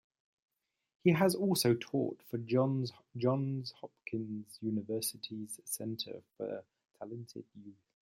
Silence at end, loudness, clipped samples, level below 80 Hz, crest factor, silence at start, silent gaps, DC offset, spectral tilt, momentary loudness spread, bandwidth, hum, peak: 0.3 s; -35 LUFS; under 0.1%; -78 dBFS; 22 dB; 1.05 s; none; under 0.1%; -5.5 dB/octave; 17 LU; 16.5 kHz; none; -14 dBFS